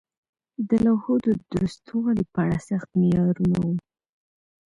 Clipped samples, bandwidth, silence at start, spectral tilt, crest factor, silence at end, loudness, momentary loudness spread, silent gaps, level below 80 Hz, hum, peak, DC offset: under 0.1%; 10.5 kHz; 0.6 s; -9 dB/octave; 14 dB; 0.9 s; -24 LUFS; 7 LU; none; -50 dBFS; none; -10 dBFS; under 0.1%